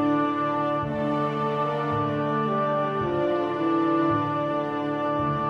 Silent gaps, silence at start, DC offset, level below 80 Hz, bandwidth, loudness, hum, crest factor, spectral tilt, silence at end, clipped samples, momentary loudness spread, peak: none; 0 s; under 0.1%; -56 dBFS; 7 kHz; -25 LUFS; none; 12 dB; -8.5 dB/octave; 0 s; under 0.1%; 3 LU; -12 dBFS